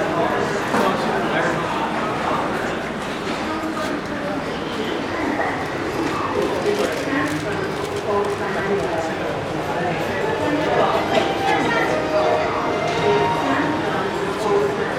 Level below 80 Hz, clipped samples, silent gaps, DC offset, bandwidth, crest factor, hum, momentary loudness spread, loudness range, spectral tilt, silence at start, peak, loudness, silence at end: -46 dBFS; under 0.1%; none; under 0.1%; 16.5 kHz; 16 dB; none; 6 LU; 5 LU; -5 dB/octave; 0 s; -4 dBFS; -21 LUFS; 0 s